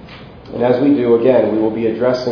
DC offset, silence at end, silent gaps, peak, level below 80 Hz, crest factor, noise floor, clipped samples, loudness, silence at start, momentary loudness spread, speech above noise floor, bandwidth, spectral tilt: under 0.1%; 0 s; none; 0 dBFS; -48 dBFS; 14 dB; -36 dBFS; under 0.1%; -14 LUFS; 0 s; 6 LU; 22 dB; 5.4 kHz; -8 dB/octave